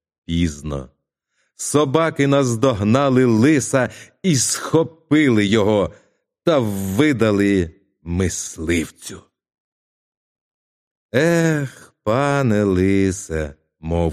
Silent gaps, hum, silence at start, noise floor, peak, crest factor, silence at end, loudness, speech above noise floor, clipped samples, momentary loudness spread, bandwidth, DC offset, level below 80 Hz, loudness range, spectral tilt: 9.60-11.09 s; none; 0.3 s; -71 dBFS; 0 dBFS; 18 dB; 0 s; -18 LUFS; 53 dB; under 0.1%; 12 LU; 15 kHz; under 0.1%; -42 dBFS; 7 LU; -5.5 dB/octave